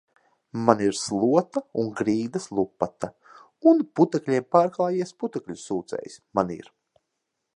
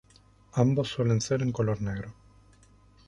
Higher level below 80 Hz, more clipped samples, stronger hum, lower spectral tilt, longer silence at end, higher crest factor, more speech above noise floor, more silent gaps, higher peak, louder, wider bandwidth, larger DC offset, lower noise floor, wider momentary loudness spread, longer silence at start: second, -64 dBFS vs -54 dBFS; neither; neither; about the same, -6 dB/octave vs -6.5 dB/octave; about the same, 0.95 s vs 0.95 s; about the same, 24 dB vs 20 dB; first, 57 dB vs 32 dB; neither; first, -2 dBFS vs -10 dBFS; first, -24 LUFS vs -28 LUFS; about the same, 11 kHz vs 11 kHz; neither; first, -80 dBFS vs -59 dBFS; first, 14 LU vs 10 LU; about the same, 0.55 s vs 0.55 s